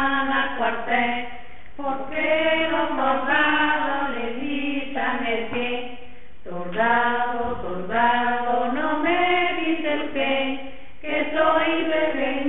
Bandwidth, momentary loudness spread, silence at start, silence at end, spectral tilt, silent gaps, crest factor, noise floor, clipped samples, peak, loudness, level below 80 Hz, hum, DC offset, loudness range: 4.1 kHz; 11 LU; 0 s; 0 s; -8.5 dB/octave; none; 16 dB; -46 dBFS; under 0.1%; -8 dBFS; -22 LUFS; -52 dBFS; none; 3%; 3 LU